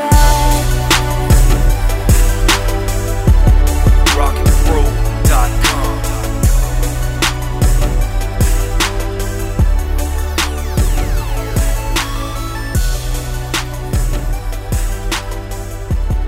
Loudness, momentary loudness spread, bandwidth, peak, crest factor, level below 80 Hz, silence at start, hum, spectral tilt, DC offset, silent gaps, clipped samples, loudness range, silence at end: -16 LUFS; 9 LU; 16.5 kHz; 0 dBFS; 12 dB; -14 dBFS; 0 s; none; -4.5 dB/octave; under 0.1%; none; under 0.1%; 6 LU; 0 s